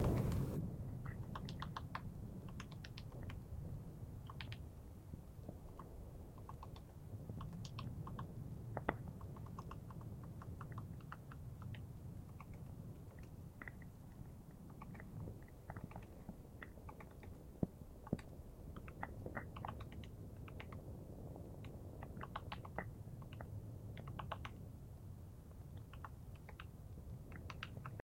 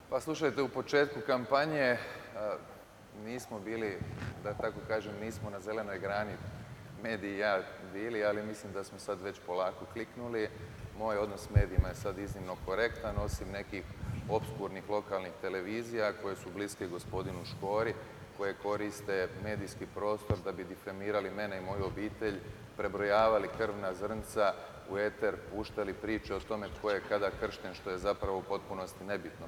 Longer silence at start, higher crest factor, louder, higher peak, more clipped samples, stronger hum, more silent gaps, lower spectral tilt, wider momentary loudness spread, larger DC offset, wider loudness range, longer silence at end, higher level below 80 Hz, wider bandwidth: about the same, 0 s vs 0 s; first, 32 dB vs 22 dB; second, -51 LUFS vs -36 LUFS; about the same, -16 dBFS vs -14 dBFS; neither; neither; neither; about the same, -7 dB/octave vs -6 dB/octave; second, 8 LU vs 11 LU; neither; about the same, 5 LU vs 5 LU; first, 0.15 s vs 0 s; second, -58 dBFS vs -50 dBFS; second, 16.5 kHz vs 19.5 kHz